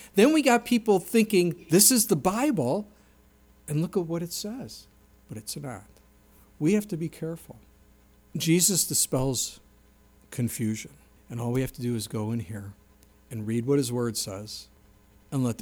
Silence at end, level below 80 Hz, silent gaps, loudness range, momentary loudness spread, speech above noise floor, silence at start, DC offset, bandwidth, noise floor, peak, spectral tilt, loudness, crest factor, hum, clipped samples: 0 s; -56 dBFS; none; 10 LU; 20 LU; 32 dB; 0 s; under 0.1%; over 20 kHz; -58 dBFS; -6 dBFS; -4 dB/octave; -26 LUFS; 22 dB; none; under 0.1%